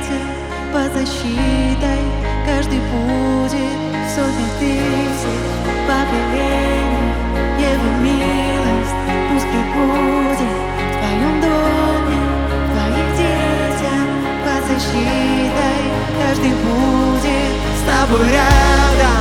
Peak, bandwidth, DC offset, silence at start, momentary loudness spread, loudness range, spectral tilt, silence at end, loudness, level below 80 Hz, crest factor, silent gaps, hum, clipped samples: 0 dBFS; 16.5 kHz; 0.3%; 0 s; 6 LU; 3 LU; -5.5 dB/octave; 0 s; -16 LUFS; -22 dBFS; 16 dB; none; none; under 0.1%